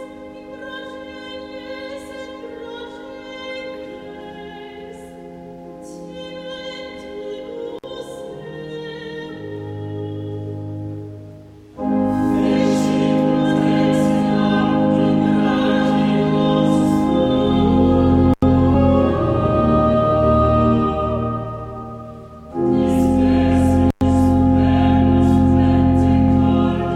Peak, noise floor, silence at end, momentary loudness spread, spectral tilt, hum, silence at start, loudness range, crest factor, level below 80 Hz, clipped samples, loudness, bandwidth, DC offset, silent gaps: -4 dBFS; -40 dBFS; 0 s; 19 LU; -8 dB/octave; none; 0 s; 17 LU; 14 dB; -34 dBFS; under 0.1%; -16 LUFS; 11 kHz; under 0.1%; none